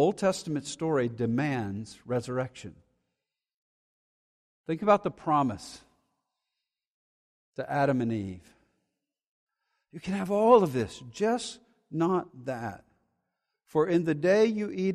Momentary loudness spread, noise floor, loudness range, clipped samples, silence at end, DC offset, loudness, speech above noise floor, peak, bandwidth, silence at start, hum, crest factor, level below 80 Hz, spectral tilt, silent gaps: 17 LU; -87 dBFS; 7 LU; under 0.1%; 0 s; under 0.1%; -28 LUFS; 60 dB; -8 dBFS; 14 kHz; 0 s; none; 22 dB; -66 dBFS; -6.5 dB/octave; 3.54-4.64 s, 6.87-7.53 s, 9.27-9.47 s